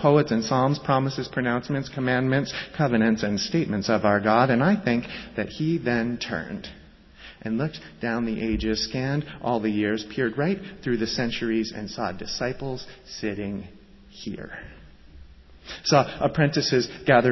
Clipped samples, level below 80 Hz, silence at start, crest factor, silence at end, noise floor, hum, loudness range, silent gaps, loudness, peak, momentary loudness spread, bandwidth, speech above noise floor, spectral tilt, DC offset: under 0.1%; -48 dBFS; 0 s; 20 dB; 0 s; -48 dBFS; none; 8 LU; none; -25 LUFS; -4 dBFS; 15 LU; 6.2 kHz; 23 dB; -6 dB/octave; under 0.1%